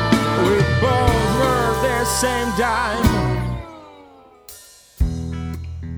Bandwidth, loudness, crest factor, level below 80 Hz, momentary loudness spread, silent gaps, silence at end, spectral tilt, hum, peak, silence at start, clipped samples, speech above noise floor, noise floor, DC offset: over 20 kHz; -19 LUFS; 18 dB; -30 dBFS; 14 LU; none; 0 s; -5 dB/octave; none; -2 dBFS; 0 s; under 0.1%; 28 dB; -46 dBFS; under 0.1%